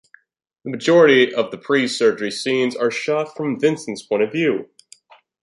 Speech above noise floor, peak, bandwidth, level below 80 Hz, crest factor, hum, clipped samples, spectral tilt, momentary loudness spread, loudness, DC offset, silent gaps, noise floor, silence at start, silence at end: 36 dB; -2 dBFS; 11.5 kHz; -70 dBFS; 18 dB; none; under 0.1%; -4.5 dB/octave; 11 LU; -18 LUFS; under 0.1%; none; -54 dBFS; 0.65 s; 0.8 s